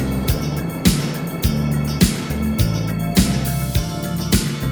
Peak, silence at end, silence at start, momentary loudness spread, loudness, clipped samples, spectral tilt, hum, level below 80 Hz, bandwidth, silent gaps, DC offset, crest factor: 0 dBFS; 0 s; 0 s; 5 LU; -20 LUFS; under 0.1%; -5 dB/octave; none; -28 dBFS; over 20 kHz; none; under 0.1%; 18 dB